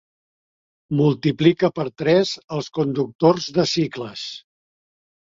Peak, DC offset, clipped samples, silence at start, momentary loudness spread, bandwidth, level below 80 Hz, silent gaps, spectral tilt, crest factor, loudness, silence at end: -2 dBFS; under 0.1%; under 0.1%; 0.9 s; 12 LU; 7.6 kHz; -60 dBFS; 2.44-2.48 s, 3.15-3.19 s; -6 dB/octave; 20 dB; -20 LUFS; 1 s